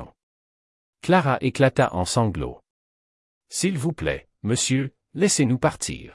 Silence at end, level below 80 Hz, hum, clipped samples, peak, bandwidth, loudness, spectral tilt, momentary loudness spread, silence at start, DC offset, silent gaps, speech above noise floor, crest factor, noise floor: 0.05 s; -48 dBFS; none; under 0.1%; -6 dBFS; 12 kHz; -23 LUFS; -4.5 dB/octave; 12 LU; 0 s; under 0.1%; 0.23-0.93 s, 2.70-3.41 s; over 68 dB; 18 dB; under -90 dBFS